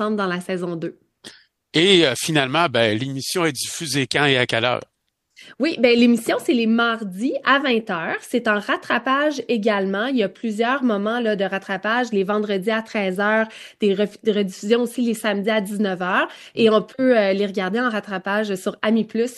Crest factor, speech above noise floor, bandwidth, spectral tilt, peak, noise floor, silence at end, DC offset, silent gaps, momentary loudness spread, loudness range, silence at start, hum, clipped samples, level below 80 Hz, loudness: 20 dB; 35 dB; 12.5 kHz; -4.5 dB/octave; -2 dBFS; -56 dBFS; 0 s; under 0.1%; none; 7 LU; 3 LU; 0 s; none; under 0.1%; -66 dBFS; -20 LUFS